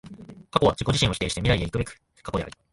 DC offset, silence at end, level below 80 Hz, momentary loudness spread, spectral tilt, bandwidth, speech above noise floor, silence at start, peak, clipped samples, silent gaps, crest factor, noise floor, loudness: under 0.1%; 0.2 s; -40 dBFS; 17 LU; -5 dB/octave; 11.5 kHz; 19 dB; 0.05 s; -4 dBFS; under 0.1%; none; 22 dB; -43 dBFS; -25 LUFS